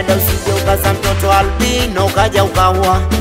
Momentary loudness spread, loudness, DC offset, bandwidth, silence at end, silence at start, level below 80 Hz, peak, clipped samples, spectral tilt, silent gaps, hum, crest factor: 3 LU; -13 LUFS; under 0.1%; 16.5 kHz; 0 s; 0 s; -22 dBFS; 0 dBFS; under 0.1%; -4.5 dB/octave; none; none; 12 dB